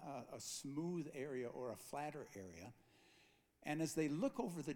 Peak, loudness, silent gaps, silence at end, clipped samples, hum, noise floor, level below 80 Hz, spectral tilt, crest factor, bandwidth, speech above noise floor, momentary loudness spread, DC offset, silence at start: -28 dBFS; -46 LUFS; none; 0 s; under 0.1%; none; -73 dBFS; -80 dBFS; -5 dB/octave; 18 dB; 19 kHz; 28 dB; 14 LU; under 0.1%; 0 s